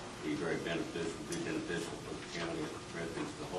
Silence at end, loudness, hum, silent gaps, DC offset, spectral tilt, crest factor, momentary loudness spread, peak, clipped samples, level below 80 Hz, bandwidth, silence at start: 0 s; -39 LUFS; none; none; under 0.1%; -4.5 dB/octave; 16 dB; 5 LU; -24 dBFS; under 0.1%; -62 dBFS; 12.5 kHz; 0 s